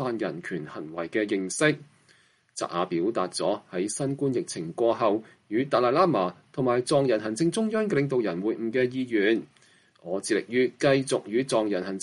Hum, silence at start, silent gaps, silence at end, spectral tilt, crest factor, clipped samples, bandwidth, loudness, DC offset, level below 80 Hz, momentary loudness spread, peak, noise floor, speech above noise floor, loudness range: none; 0 s; none; 0 s; -5 dB/octave; 18 dB; under 0.1%; 11.5 kHz; -27 LUFS; under 0.1%; -70 dBFS; 9 LU; -8 dBFS; -62 dBFS; 36 dB; 4 LU